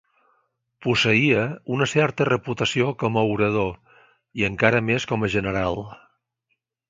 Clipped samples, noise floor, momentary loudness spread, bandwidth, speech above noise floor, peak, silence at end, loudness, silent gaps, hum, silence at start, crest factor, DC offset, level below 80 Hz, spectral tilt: under 0.1%; -75 dBFS; 9 LU; 9.2 kHz; 54 dB; 0 dBFS; 0.95 s; -22 LUFS; none; none; 0.8 s; 22 dB; under 0.1%; -50 dBFS; -5.5 dB/octave